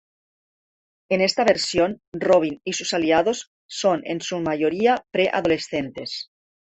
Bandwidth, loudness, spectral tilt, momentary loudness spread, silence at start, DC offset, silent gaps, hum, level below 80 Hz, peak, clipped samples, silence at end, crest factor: 8.6 kHz; -22 LUFS; -4 dB/octave; 11 LU; 1.1 s; under 0.1%; 2.07-2.12 s, 3.47-3.69 s; none; -58 dBFS; -4 dBFS; under 0.1%; 0.4 s; 18 dB